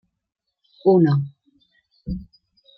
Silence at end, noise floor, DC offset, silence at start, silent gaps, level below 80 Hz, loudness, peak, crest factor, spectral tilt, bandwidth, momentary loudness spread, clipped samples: 0.55 s; -63 dBFS; under 0.1%; 0.85 s; none; -46 dBFS; -20 LUFS; -6 dBFS; 18 dB; -11.5 dB/octave; 5.6 kHz; 18 LU; under 0.1%